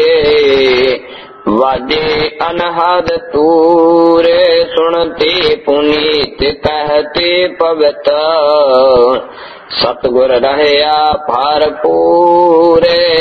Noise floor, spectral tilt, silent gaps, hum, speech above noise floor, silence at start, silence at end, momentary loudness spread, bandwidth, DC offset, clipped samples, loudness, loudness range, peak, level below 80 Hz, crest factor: -29 dBFS; -6 dB/octave; none; none; 20 dB; 0 s; 0 s; 7 LU; 6.2 kHz; under 0.1%; 0.2%; -10 LUFS; 2 LU; 0 dBFS; -38 dBFS; 10 dB